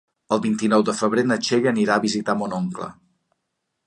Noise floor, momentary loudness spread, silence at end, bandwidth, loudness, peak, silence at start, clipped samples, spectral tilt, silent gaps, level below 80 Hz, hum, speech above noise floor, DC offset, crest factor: -77 dBFS; 8 LU; 0.95 s; 11 kHz; -21 LUFS; -4 dBFS; 0.3 s; under 0.1%; -5 dB/octave; none; -64 dBFS; none; 57 dB; under 0.1%; 18 dB